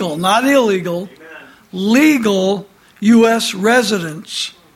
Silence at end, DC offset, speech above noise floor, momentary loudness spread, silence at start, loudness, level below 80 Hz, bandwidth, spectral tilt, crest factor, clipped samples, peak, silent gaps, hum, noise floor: 0.25 s; under 0.1%; 25 dB; 12 LU; 0 s; -14 LUFS; -58 dBFS; 16 kHz; -4.5 dB/octave; 14 dB; under 0.1%; -2 dBFS; none; none; -38 dBFS